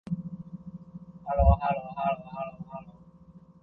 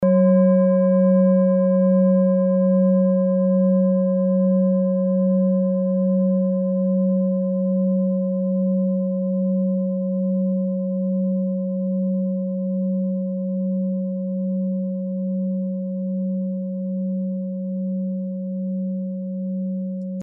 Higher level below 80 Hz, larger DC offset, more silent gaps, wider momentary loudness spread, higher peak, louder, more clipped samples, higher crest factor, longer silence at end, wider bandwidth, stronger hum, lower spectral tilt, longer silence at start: first, -34 dBFS vs -74 dBFS; neither; neither; first, 21 LU vs 10 LU; about the same, -8 dBFS vs -8 dBFS; second, -29 LUFS vs -21 LUFS; neither; first, 22 dB vs 12 dB; first, 0.25 s vs 0 s; first, 4.4 kHz vs 2.4 kHz; neither; about the same, -10.5 dB/octave vs -11 dB/octave; about the same, 0.05 s vs 0 s